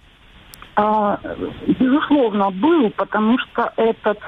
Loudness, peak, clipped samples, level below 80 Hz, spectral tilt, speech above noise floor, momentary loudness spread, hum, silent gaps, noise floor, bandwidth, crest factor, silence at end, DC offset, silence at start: -18 LUFS; -2 dBFS; under 0.1%; -50 dBFS; -7.5 dB/octave; 29 dB; 7 LU; none; none; -47 dBFS; 13 kHz; 16 dB; 0 s; under 0.1%; 0.6 s